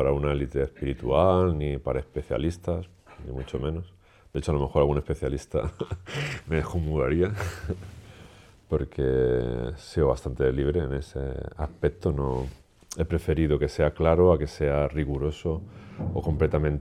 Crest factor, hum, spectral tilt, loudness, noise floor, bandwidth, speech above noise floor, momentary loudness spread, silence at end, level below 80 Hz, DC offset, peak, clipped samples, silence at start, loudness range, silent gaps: 20 dB; none; -7.5 dB/octave; -27 LUFS; -51 dBFS; 13 kHz; 25 dB; 12 LU; 0 s; -38 dBFS; under 0.1%; -6 dBFS; under 0.1%; 0 s; 4 LU; none